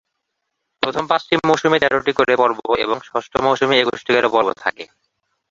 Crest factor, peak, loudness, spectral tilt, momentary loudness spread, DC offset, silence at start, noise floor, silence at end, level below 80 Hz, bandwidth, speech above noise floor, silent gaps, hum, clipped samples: 18 dB; 0 dBFS; -17 LUFS; -4.5 dB/octave; 8 LU; under 0.1%; 0.8 s; -76 dBFS; 0.65 s; -54 dBFS; 7.8 kHz; 58 dB; none; none; under 0.1%